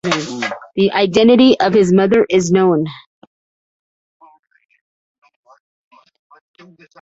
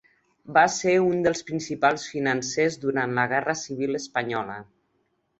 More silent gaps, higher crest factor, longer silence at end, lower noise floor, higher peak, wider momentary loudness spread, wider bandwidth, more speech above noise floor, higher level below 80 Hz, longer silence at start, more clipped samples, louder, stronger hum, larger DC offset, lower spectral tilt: neither; about the same, 16 dB vs 20 dB; first, 4.05 s vs 0.75 s; first, under -90 dBFS vs -71 dBFS; about the same, -2 dBFS vs -4 dBFS; first, 13 LU vs 9 LU; about the same, 8 kHz vs 8.2 kHz; first, over 78 dB vs 47 dB; first, -54 dBFS vs -64 dBFS; second, 0.05 s vs 0.45 s; neither; first, -13 LUFS vs -24 LUFS; neither; neither; about the same, -5.5 dB/octave vs -4.5 dB/octave